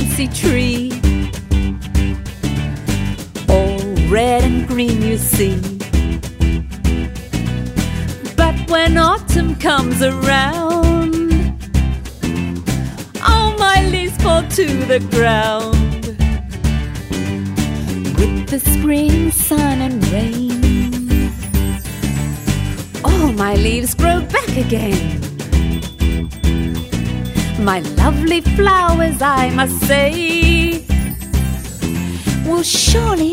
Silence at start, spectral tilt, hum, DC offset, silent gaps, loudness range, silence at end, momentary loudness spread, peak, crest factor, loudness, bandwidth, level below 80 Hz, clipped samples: 0 s; -5 dB/octave; none; under 0.1%; none; 4 LU; 0 s; 8 LU; 0 dBFS; 14 dB; -16 LUFS; 16.5 kHz; -20 dBFS; under 0.1%